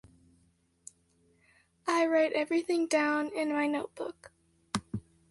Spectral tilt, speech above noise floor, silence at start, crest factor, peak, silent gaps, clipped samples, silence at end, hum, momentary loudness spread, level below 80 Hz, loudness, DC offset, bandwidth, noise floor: -4.5 dB/octave; 40 dB; 1.85 s; 22 dB; -12 dBFS; none; under 0.1%; 0.3 s; none; 21 LU; -68 dBFS; -30 LUFS; under 0.1%; 11.5 kHz; -69 dBFS